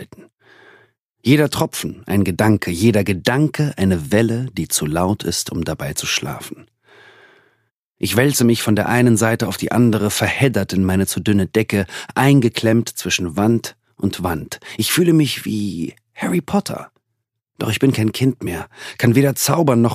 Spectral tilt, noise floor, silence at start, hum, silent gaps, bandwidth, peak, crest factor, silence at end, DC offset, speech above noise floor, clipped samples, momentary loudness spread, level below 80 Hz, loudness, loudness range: -5 dB/octave; -76 dBFS; 0 s; none; 0.34-0.38 s, 1.05-1.15 s, 7.76-7.91 s; 15.5 kHz; 0 dBFS; 18 dB; 0 s; under 0.1%; 59 dB; under 0.1%; 11 LU; -48 dBFS; -18 LUFS; 5 LU